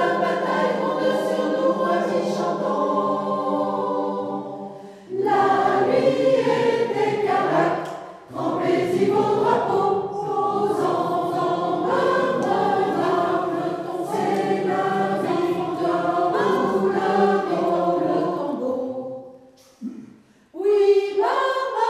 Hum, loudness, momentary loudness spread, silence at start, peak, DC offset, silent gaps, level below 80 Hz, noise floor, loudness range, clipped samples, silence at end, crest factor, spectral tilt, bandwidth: none; -22 LUFS; 9 LU; 0 s; -4 dBFS; under 0.1%; none; -68 dBFS; -50 dBFS; 3 LU; under 0.1%; 0 s; 16 dB; -6 dB/octave; 13.5 kHz